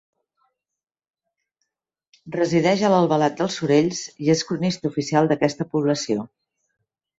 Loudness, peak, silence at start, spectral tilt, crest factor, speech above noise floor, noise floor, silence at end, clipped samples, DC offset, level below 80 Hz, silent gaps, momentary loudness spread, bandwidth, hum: -21 LUFS; -4 dBFS; 2.25 s; -5.5 dB/octave; 18 dB; 67 dB; -88 dBFS; 0.9 s; under 0.1%; under 0.1%; -62 dBFS; none; 8 LU; 8 kHz; none